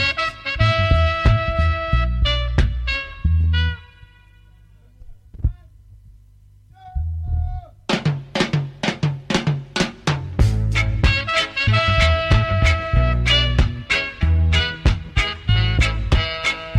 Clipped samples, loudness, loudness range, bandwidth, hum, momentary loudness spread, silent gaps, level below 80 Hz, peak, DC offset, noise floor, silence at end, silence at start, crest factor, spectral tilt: under 0.1%; -20 LUFS; 12 LU; 10.5 kHz; none; 9 LU; none; -24 dBFS; -2 dBFS; under 0.1%; -49 dBFS; 0 s; 0 s; 16 dB; -5.5 dB/octave